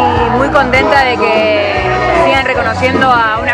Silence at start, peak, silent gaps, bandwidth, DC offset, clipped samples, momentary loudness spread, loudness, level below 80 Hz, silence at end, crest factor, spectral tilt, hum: 0 s; 0 dBFS; none; 12 kHz; under 0.1%; 0.5%; 3 LU; -10 LUFS; -30 dBFS; 0 s; 10 dB; -5.5 dB/octave; none